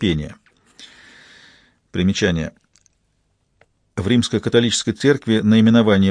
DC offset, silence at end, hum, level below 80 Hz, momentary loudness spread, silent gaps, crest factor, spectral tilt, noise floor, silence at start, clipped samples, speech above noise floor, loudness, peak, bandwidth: under 0.1%; 0 s; none; -46 dBFS; 15 LU; none; 18 dB; -5.5 dB/octave; -66 dBFS; 0 s; under 0.1%; 50 dB; -17 LUFS; 0 dBFS; 10 kHz